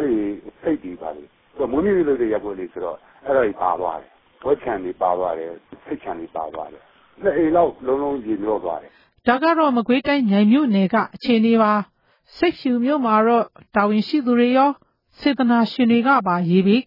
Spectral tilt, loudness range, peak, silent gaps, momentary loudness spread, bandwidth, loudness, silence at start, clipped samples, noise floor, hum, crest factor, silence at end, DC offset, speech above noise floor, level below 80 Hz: -9 dB/octave; 6 LU; -4 dBFS; none; 15 LU; 5.6 kHz; -20 LUFS; 0 s; under 0.1%; -38 dBFS; none; 16 dB; 0.05 s; under 0.1%; 19 dB; -54 dBFS